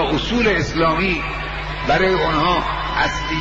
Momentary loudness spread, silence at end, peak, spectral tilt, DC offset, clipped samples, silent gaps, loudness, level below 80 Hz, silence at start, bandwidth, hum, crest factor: 8 LU; 0 s; -6 dBFS; -5 dB/octave; under 0.1%; under 0.1%; none; -18 LUFS; -30 dBFS; 0 s; 8.2 kHz; none; 12 dB